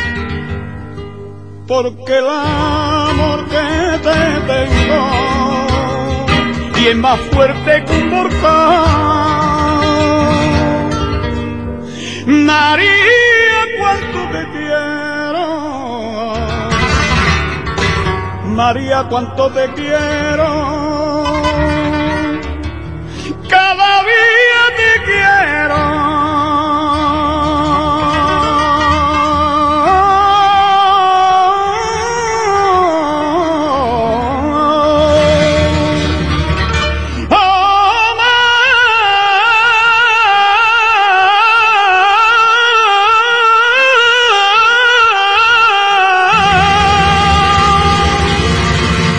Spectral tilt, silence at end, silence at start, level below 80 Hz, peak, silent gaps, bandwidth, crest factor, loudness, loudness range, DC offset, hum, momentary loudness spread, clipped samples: -4.5 dB/octave; 0 s; 0 s; -26 dBFS; 0 dBFS; none; 10.5 kHz; 12 dB; -11 LUFS; 7 LU; 1%; none; 10 LU; under 0.1%